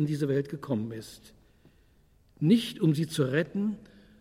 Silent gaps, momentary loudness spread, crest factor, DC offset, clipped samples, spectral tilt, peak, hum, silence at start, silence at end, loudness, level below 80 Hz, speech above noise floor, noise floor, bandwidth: none; 15 LU; 18 dB; under 0.1%; under 0.1%; -7 dB/octave; -12 dBFS; none; 0 s; 0.35 s; -28 LUFS; -64 dBFS; 34 dB; -62 dBFS; 15.5 kHz